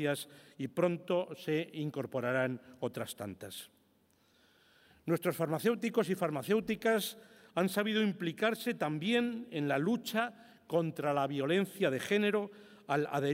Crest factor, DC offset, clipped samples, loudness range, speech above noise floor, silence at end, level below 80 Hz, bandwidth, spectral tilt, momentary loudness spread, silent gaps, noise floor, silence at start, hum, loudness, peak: 18 dB; under 0.1%; under 0.1%; 6 LU; 37 dB; 0 s; -78 dBFS; 16 kHz; -5.5 dB/octave; 11 LU; none; -70 dBFS; 0 s; none; -34 LUFS; -18 dBFS